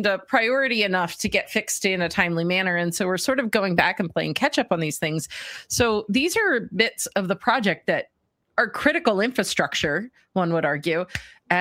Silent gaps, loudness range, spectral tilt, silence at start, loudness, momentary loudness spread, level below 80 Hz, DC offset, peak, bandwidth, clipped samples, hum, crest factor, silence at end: none; 1 LU; -4 dB/octave; 0 s; -23 LUFS; 6 LU; -54 dBFS; under 0.1%; -2 dBFS; 16 kHz; under 0.1%; none; 22 dB; 0 s